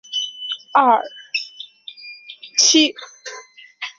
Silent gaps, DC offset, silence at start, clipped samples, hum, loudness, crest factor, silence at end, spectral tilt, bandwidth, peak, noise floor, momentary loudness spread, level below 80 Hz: none; under 0.1%; 0.1 s; under 0.1%; none; -17 LUFS; 20 dB; 0.1 s; 1 dB/octave; 7.8 kHz; -2 dBFS; -41 dBFS; 23 LU; -72 dBFS